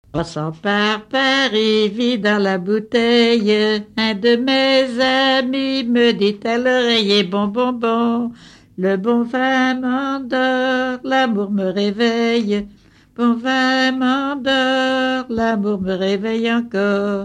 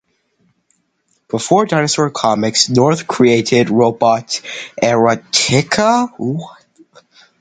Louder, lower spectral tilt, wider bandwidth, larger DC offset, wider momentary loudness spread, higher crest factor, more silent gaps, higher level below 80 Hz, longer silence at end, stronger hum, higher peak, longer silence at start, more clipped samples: second, -17 LUFS vs -14 LUFS; about the same, -5 dB/octave vs -4 dB/octave; about the same, 10 kHz vs 9.6 kHz; neither; second, 6 LU vs 10 LU; about the same, 14 dB vs 16 dB; neither; about the same, -54 dBFS vs -54 dBFS; second, 0 s vs 0.9 s; neither; second, -4 dBFS vs 0 dBFS; second, 0.15 s vs 1.35 s; neither